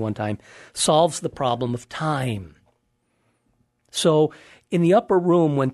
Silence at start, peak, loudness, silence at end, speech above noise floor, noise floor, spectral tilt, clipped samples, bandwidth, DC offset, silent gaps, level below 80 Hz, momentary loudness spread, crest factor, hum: 0 s; -4 dBFS; -21 LUFS; 0 s; 48 dB; -70 dBFS; -5.5 dB/octave; under 0.1%; 12.5 kHz; under 0.1%; none; -58 dBFS; 11 LU; 18 dB; none